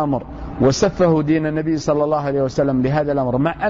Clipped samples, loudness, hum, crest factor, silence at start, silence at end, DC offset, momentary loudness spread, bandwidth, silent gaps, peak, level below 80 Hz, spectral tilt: under 0.1%; -18 LUFS; none; 12 dB; 0 s; 0 s; under 0.1%; 4 LU; 7.8 kHz; none; -6 dBFS; -38 dBFS; -6.5 dB/octave